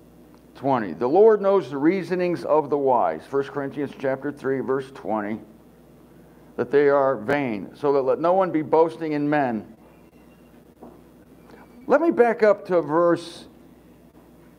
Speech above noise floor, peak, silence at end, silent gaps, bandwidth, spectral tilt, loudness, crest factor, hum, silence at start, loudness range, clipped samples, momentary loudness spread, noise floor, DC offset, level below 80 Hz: 29 dB; -4 dBFS; 1.15 s; none; 10.5 kHz; -7.5 dB/octave; -22 LUFS; 18 dB; none; 0.55 s; 6 LU; under 0.1%; 11 LU; -51 dBFS; under 0.1%; -62 dBFS